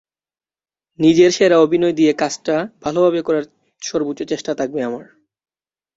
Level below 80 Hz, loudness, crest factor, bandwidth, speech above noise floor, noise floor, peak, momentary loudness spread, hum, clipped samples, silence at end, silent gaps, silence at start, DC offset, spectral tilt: -58 dBFS; -17 LUFS; 16 dB; 8 kHz; over 74 dB; under -90 dBFS; -2 dBFS; 12 LU; none; under 0.1%; 0.95 s; none; 1 s; under 0.1%; -5 dB/octave